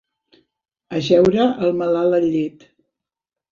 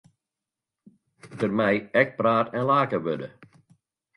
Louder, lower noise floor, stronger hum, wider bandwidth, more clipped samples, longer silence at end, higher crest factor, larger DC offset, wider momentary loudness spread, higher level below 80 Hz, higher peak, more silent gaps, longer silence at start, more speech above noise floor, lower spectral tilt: first, -18 LUFS vs -24 LUFS; about the same, -88 dBFS vs -88 dBFS; neither; second, 7.4 kHz vs 11 kHz; neither; first, 1 s vs 0.7 s; about the same, 18 dB vs 22 dB; neither; about the same, 11 LU vs 11 LU; first, -56 dBFS vs -66 dBFS; about the same, -2 dBFS vs -4 dBFS; neither; second, 0.9 s vs 1.25 s; first, 71 dB vs 65 dB; about the same, -7 dB/octave vs -7.5 dB/octave